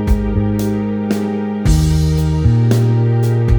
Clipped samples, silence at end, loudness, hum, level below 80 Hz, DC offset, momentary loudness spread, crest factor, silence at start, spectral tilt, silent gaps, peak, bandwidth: under 0.1%; 0 s; -15 LUFS; none; -20 dBFS; under 0.1%; 5 LU; 12 dB; 0 s; -7.5 dB/octave; none; 0 dBFS; over 20 kHz